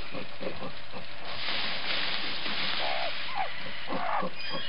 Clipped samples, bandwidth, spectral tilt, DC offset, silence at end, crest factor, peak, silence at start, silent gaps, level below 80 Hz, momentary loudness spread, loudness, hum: under 0.1%; 8.8 kHz; -6 dB/octave; 4%; 0 s; 20 dB; -16 dBFS; 0 s; none; -64 dBFS; 11 LU; -32 LUFS; none